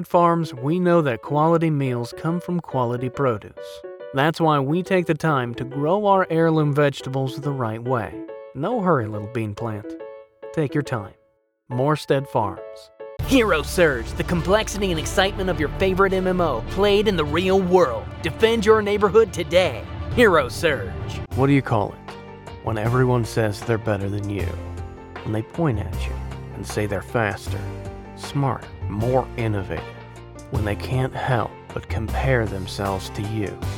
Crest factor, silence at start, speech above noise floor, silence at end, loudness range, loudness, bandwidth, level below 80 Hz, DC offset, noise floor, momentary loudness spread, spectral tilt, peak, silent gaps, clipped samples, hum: 18 dB; 0 s; 43 dB; 0 s; 7 LU; -22 LUFS; 18.5 kHz; -38 dBFS; under 0.1%; -64 dBFS; 15 LU; -6 dB/octave; -4 dBFS; none; under 0.1%; none